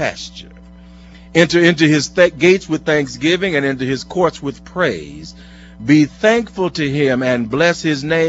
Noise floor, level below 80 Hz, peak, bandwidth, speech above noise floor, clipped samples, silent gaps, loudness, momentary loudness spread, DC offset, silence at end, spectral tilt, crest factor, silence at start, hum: -39 dBFS; -44 dBFS; 0 dBFS; 8 kHz; 24 dB; under 0.1%; none; -15 LUFS; 15 LU; under 0.1%; 0 s; -5 dB/octave; 16 dB; 0 s; none